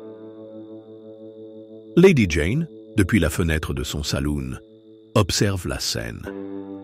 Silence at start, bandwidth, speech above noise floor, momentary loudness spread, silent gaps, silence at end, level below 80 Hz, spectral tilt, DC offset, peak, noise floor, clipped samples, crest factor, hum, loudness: 0 s; 16 kHz; 21 dB; 24 LU; none; 0 s; -36 dBFS; -5.5 dB/octave; under 0.1%; -4 dBFS; -41 dBFS; under 0.1%; 18 dB; none; -21 LUFS